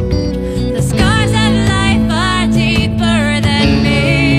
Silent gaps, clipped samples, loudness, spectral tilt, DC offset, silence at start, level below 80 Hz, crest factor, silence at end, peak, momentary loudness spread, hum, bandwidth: none; under 0.1%; -12 LUFS; -5.5 dB/octave; under 0.1%; 0 s; -22 dBFS; 12 dB; 0 s; 0 dBFS; 5 LU; none; 14.5 kHz